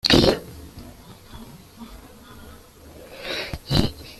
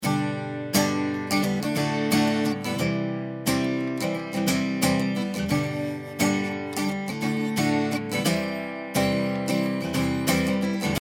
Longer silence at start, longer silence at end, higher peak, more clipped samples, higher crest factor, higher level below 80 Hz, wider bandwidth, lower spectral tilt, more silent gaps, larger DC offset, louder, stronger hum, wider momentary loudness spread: about the same, 0.05 s vs 0 s; about the same, 0.05 s vs 0 s; first, -2 dBFS vs -8 dBFS; neither; first, 24 dB vs 18 dB; first, -38 dBFS vs -56 dBFS; second, 15 kHz vs 19.5 kHz; about the same, -5 dB/octave vs -5 dB/octave; neither; neither; first, -22 LUFS vs -25 LUFS; neither; first, 25 LU vs 5 LU